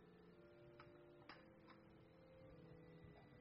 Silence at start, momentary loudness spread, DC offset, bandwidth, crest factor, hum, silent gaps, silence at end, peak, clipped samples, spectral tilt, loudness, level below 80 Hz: 0 s; 4 LU; under 0.1%; 5.4 kHz; 22 dB; none; none; 0 s; -42 dBFS; under 0.1%; -5.5 dB/octave; -65 LUFS; -80 dBFS